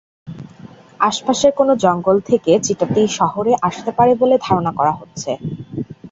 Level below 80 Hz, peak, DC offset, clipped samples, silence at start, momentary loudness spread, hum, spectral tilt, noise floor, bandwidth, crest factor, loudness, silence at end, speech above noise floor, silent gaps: -52 dBFS; 0 dBFS; under 0.1%; under 0.1%; 0.25 s; 14 LU; none; -5 dB/octave; -40 dBFS; 8 kHz; 16 dB; -16 LUFS; 0.05 s; 24 dB; none